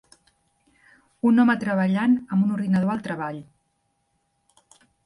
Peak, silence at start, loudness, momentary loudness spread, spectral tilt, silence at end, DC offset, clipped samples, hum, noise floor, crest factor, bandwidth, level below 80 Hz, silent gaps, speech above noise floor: -10 dBFS; 1.25 s; -22 LUFS; 12 LU; -8 dB/octave; 1.6 s; under 0.1%; under 0.1%; none; -72 dBFS; 16 dB; 11 kHz; -66 dBFS; none; 51 dB